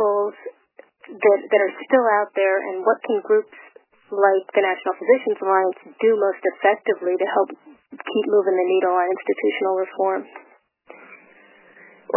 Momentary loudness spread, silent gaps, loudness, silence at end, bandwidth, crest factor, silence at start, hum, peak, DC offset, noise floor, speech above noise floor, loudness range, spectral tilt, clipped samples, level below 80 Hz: 8 LU; none; -20 LUFS; 0.05 s; 3.1 kHz; 18 dB; 0 s; none; -4 dBFS; under 0.1%; -51 dBFS; 31 dB; 2 LU; -8.5 dB/octave; under 0.1%; under -90 dBFS